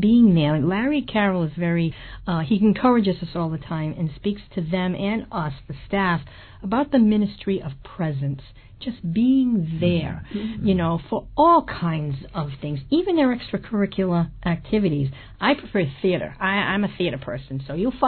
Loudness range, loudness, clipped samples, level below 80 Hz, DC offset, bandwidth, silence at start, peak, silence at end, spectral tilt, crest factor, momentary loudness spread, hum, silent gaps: 3 LU; -22 LUFS; under 0.1%; -44 dBFS; under 0.1%; 4.5 kHz; 0 s; -6 dBFS; 0 s; -11 dB/octave; 16 dB; 12 LU; none; none